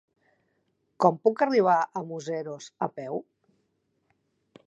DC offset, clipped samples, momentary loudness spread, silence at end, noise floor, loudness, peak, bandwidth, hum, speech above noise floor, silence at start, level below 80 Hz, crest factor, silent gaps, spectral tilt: under 0.1%; under 0.1%; 13 LU; 1.45 s; -74 dBFS; -26 LUFS; -6 dBFS; 8 kHz; none; 48 dB; 1 s; -84 dBFS; 22 dB; none; -6 dB/octave